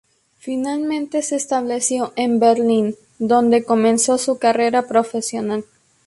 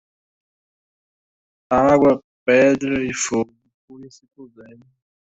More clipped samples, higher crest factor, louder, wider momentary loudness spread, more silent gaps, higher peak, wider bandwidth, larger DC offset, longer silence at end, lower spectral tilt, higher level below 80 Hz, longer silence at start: neither; about the same, 16 dB vs 18 dB; about the same, -18 LUFS vs -18 LUFS; about the same, 10 LU vs 9 LU; second, none vs 2.24-2.46 s, 3.74-3.88 s; about the same, -2 dBFS vs -4 dBFS; first, 11.5 kHz vs 8.2 kHz; neither; second, 0.45 s vs 0.85 s; about the same, -4 dB/octave vs -5 dB/octave; second, -64 dBFS vs -54 dBFS; second, 0.45 s vs 1.7 s